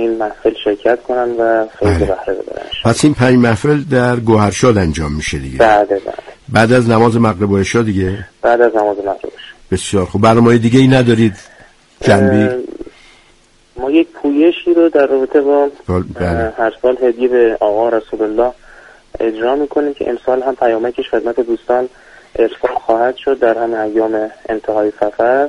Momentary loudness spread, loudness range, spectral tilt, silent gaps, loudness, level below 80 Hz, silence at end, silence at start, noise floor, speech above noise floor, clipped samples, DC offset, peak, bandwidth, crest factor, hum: 10 LU; 4 LU; -6.5 dB/octave; none; -13 LUFS; -36 dBFS; 0 s; 0 s; -49 dBFS; 36 dB; under 0.1%; under 0.1%; 0 dBFS; 11.5 kHz; 14 dB; none